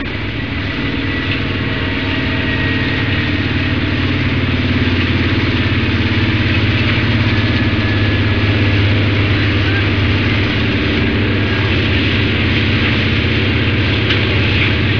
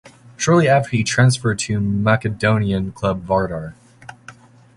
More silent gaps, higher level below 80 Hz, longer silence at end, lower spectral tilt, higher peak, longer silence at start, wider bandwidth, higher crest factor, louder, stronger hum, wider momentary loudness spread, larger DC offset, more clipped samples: neither; first, -28 dBFS vs -44 dBFS; second, 0 s vs 0.45 s; first, -7 dB/octave vs -5.5 dB/octave; about the same, -2 dBFS vs -2 dBFS; about the same, 0 s vs 0.05 s; second, 5.4 kHz vs 11.5 kHz; second, 12 dB vs 18 dB; first, -14 LUFS vs -18 LUFS; neither; second, 4 LU vs 12 LU; first, 2% vs under 0.1%; neither